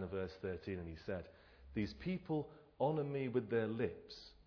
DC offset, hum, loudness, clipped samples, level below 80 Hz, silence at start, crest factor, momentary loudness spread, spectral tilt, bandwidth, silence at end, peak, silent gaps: under 0.1%; none; -42 LUFS; under 0.1%; -64 dBFS; 0 s; 18 dB; 10 LU; -6.5 dB/octave; 5.4 kHz; 0.05 s; -24 dBFS; none